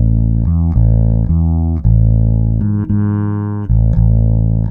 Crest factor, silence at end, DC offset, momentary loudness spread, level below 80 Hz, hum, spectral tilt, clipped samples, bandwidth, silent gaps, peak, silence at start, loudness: 10 dB; 0 s; under 0.1%; 4 LU; -16 dBFS; none; -14 dB/octave; under 0.1%; 1.8 kHz; none; -2 dBFS; 0 s; -14 LUFS